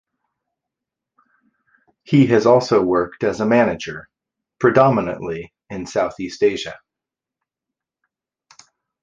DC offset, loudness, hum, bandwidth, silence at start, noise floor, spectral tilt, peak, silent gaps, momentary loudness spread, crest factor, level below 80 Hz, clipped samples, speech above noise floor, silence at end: under 0.1%; -18 LUFS; none; 7.8 kHz; 2.1 s; -86 dBFS; -6.5 dB/octave; 0 dBFS; none; 17 LU; 20 dB; -54 dBFS; under 0.1%; 69 dB; 2.25 s